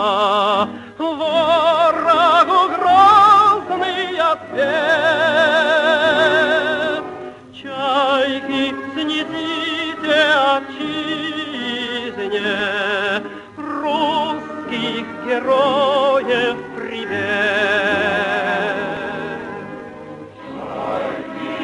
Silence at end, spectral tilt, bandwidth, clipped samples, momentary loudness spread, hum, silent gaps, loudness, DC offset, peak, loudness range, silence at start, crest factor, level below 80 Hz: 0 s; -4 dB/octave; 11.5 kHz; under 0.1%; 14 LU; none; none; -17 LUFS; under 0.1%; -2 dBFS; 8 LU; 0 s; 16 dB; -58 dBFS